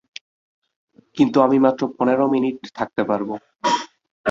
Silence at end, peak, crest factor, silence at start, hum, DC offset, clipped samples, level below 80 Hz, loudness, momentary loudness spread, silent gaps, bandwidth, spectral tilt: 0 s; -2 dBFS; 18 dB; 1.15 s; none; under 0.1%; under 0.1%; -64 dBFS; -20 LUFS; 19 LU; 4.11-4.24 s; 7.6 kHz; -6 dB/octave